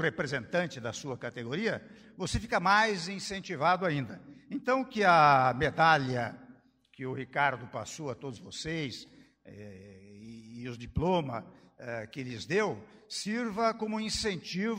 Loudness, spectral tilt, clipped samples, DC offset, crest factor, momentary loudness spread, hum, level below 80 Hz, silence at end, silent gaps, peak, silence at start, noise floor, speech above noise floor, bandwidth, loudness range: -30 LUFS; -4.5 dB/octave; under 0.1%; under 0.1%; 22 dB; 18 LU; none; -54 dBFS; 0 s; none; -10 dBFS; 0 s; -59 dBFS; 28 dB; 16 kHz; 11 LU